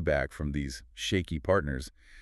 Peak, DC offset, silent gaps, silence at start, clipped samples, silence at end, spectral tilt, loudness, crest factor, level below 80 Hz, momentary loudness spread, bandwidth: -12 dBFS; under 0.1%; none; 0 s; under 0.1%; 0 s; -5.5 dB/octave; -31 LUFS; 20 dB; -42 dBFS; 10 LU; 13 kHz